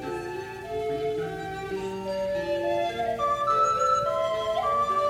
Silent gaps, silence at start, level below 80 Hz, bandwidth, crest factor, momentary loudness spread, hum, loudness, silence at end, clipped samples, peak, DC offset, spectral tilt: none; 0 s; -54 dBFS; 16.5 kHz; 14 dB; 11 LU; none; -27 LUFS; 0 s; under 0.1%; -14 dBFS; under 0.1%; -4.5 dB/octave